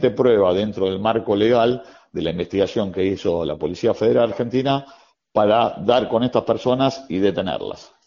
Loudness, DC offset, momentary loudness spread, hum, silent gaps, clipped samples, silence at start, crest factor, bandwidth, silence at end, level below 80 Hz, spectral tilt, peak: -20 LUFS; under 0.1%; 8 LU; none; none; under 0.1%; 0 s; 18 dB; 7.2 kHz; 0.2 s; -52 dBFS; -5 dB/octave; -2 dBFS